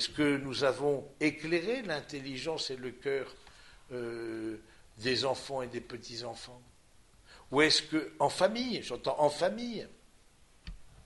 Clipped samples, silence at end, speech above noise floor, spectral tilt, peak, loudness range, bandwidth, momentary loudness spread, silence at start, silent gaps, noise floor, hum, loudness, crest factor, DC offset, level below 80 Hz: under 0.1%; 0.05 s; 28 dB; -4 dB/octave; -12 dBFS; 7 LU; 11.5 kHz; 16 LU; 0 s; none; -61 dBFS; none; -33 LUFS; 22 dB; under 0.1%; -60 dBFS